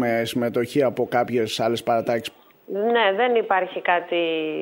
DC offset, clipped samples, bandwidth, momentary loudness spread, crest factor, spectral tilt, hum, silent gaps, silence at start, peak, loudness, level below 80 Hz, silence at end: under 0.1%; under 0.1%; 16.5 kHz; 6 LU; 16 dB; -5 dB/octave; none; none; 0 s; -6 dBFS; -22 LUFS; -66 dBFS; 0 s